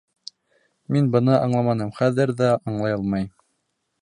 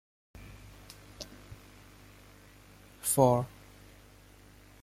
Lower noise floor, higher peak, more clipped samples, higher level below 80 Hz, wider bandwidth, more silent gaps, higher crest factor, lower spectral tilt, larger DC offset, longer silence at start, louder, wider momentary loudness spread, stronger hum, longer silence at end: first, -74 dBFS vs -56 dBFS; first, -4 dBFS vs -10 dBFS; neither; about the same, -56 dBFS vs -58 dBFS; second, 10.5 kHz vs 16 kHz; neither; second, 18 dB vs 26 dB; first, -8 dB/octave vs -5.5 dB/octave; neither; first, 0.9 s vs 0.4 s; first, -21 LUFS vs -28 LUFS; second, 16 LU vs 29 LU; second, none vs 50 Hz at -55 dBFS; second, 0.7 s vs 1.35 s